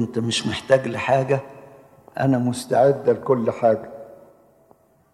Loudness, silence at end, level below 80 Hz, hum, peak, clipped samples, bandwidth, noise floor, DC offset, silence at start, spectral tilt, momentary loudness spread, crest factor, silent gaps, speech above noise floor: -21 LUFS; 1 s; -62 dBFS; none; -4 dBFS; under 0.1%; 13 kHz; -57 dBFS; under 0.1%; 0 s; -5.5 dB/octave; 12 LU; 18 dB; none; 37 dB